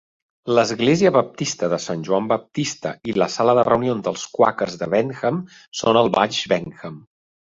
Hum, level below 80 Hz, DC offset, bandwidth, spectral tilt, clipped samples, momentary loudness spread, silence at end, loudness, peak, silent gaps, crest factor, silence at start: none; -58 dBFS; under 0.1%; 7.8 kHz; -5 dB/octave; under 0.1%; 10 LU; 0.6 s; -20 LUFS; -2 dBFS; 5.68-5.72 s; 18 dB; 0.45 s